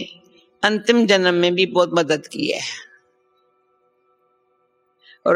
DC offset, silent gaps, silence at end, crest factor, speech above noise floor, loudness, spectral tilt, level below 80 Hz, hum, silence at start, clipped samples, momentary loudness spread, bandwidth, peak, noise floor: under 0.1%; none; 0 s; 22 dB; 47 dB; -18 LUFS; -4 dB/octave; -68 dBFS; none; 0 s; under 0.1%; 12 LU; 11.5 kHz; 0 dBFS; -65 dBFS